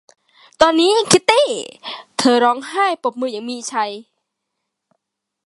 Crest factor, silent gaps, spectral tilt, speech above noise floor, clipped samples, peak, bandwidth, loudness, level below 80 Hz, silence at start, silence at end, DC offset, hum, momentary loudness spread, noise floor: 18 dB; none; -2.5 dB/octave; 61 dB; under 0.1%; 0 dBFS; 11.5 kHz; -16 LUFS; -58 dBFS; 0.6 s; 1.45 s; under 0.1%; none; 14 LU; -77 dBFS